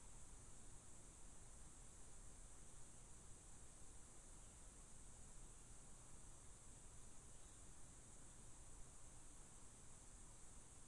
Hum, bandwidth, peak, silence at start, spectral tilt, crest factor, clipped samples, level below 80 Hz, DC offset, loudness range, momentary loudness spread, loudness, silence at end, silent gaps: none; 11.5 kHz; -46 dBFS; 0 s; -3 dB/octave; 14 dB; under 0.1%; -66 dBFS; under 0.1%; 0 LU; 0 LU; -63 LUFS; 0 s; none